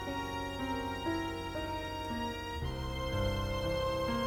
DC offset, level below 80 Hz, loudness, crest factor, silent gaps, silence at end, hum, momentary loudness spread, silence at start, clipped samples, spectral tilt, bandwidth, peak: under 0.1%; -44 dBFS; -36 LUFS; 14 dB; none; 0 s; none; 5 LU; 0 s; under 0.1%; -5.5 dB/octave; over 20 kHz; -20 dBFS